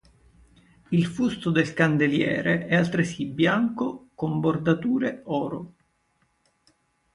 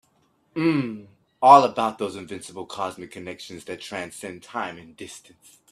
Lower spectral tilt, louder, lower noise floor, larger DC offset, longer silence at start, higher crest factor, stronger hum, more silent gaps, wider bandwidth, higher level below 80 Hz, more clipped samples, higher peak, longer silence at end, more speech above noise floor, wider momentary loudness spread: first, -7 dB/octave vs -5 dB/octave; about the same, -24 LUFS vs -22 LUFS; first, -69 dBFS vs -65 dBFS; neither; first, 0.9 s vs 0.55 s; second, 18 dB vs 24 dB; neither; neither; second, 11 kHz vs 13 kHz; first, -58 dBFS vs -68 dBFS; neither; second, -6 dBFS vs 0 dBFS; first, 1.45 s vs 0.55 s; about the same, 45 dB vs 42 dB; second, 9 LU vs 25 LU